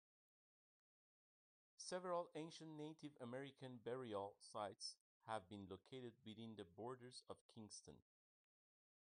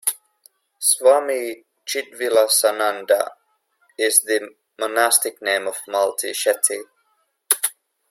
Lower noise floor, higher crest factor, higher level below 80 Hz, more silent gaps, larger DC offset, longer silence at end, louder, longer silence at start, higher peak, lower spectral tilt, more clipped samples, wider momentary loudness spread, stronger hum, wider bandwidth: first, under -90 dBFS vs -67 dBFS; about the same, 22 dB vs 22 dB; second, under -90 dBFS vs -74 dBFS; first, 5.00-5.20 s, 7.41-7.49 s vs none; neither; first, 1 s vs 0.4 s; second, -54 LUFS vs -19 LUFS; first, 1.8 s vs 0.05 s; second, -34 dBFS vs 0 dBFS; first, -4.5 dB/octave vs 1 dB/octave; neither; about the same, 10 LU vs 12 LU; neither; second, 10 kHz vs 16.5 kHz